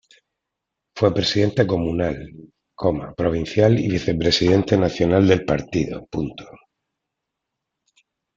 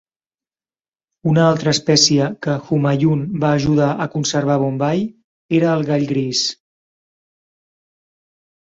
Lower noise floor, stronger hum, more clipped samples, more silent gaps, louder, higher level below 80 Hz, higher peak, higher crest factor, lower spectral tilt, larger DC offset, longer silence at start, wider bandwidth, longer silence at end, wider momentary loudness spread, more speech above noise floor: second, -82 dBFS vs under -90 dBFS; neither; neither; second, none vs 5.24-5.49 s; second, -20 LUFS vs -17 LUFS; first, -46 dBFS vs -54 dBFS; about the same, -2 dBFS vs 0 dBFS; about the same, 20 dB vs 18 dB; first, -6.5 dB/octave vs -5 dB/octave; neither; second, 0.95 s vs 1.25 s; about the same, 7.6 kHz vs 8 kHz; second, 1.85 s vs 2.2 s; first, 11 LU vs 7 LU; second, 63 dB vs over 74 dB